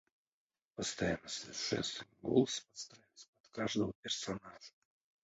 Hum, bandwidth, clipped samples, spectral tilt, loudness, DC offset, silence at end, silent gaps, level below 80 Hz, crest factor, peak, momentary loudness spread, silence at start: none; 8 kHz; under 0.1%; -4 dB/octave; -38 LUFS; under 0.1%; 0.55 s; 3.28-3.33 s, 3.40-3.44 s, 3.95-4.03 s; -66 dBFS; 24 dB; -16 dBFS; 20 LU; 0.8 s